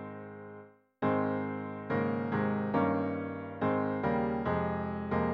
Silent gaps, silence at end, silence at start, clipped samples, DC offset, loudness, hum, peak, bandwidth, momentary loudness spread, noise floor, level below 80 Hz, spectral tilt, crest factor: none; 0 s; 0 s; under 0.1%; under 0.1%; -32 LUFS; none; -16 dBFS; 5.4 kHz; 14 LU; -53 dBFS; -58 dBFS; -10.5 dB/octave; 16 dB